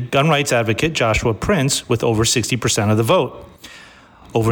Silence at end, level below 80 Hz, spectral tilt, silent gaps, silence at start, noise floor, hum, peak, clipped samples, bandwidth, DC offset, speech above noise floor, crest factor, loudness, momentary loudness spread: 0 s; -38 dBFS; -4.5 dB/octave; none; 0 s; -44 dBFS; none; -6 dBFS; under 0.1%; 19 kHz; under 0.1%; 27 dB; 12 dB; -17 LUFS; 4 LU